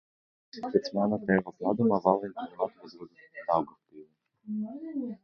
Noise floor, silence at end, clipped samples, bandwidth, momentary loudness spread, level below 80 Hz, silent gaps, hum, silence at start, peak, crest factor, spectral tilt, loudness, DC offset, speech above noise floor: -55 dBFS; 0.1 s; under 0.1%; 6.6 kHz; 20 LU; -70 dBFS; none; none; 0.55 s; -8 dBFS; 24 dB; -8 dB/octave; -30 LUFS; under 0.1%; 25 dB